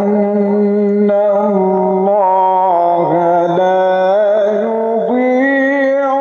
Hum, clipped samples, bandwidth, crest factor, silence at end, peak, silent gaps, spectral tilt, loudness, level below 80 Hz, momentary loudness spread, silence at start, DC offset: none; under 0.1%; 6.8 kHz; 10 dB; 0 s; -2 dBFS; none; -8.5 dB/octave; -12 LUFS; -66 dBFS; 2 LU; 0 s; under 0.1%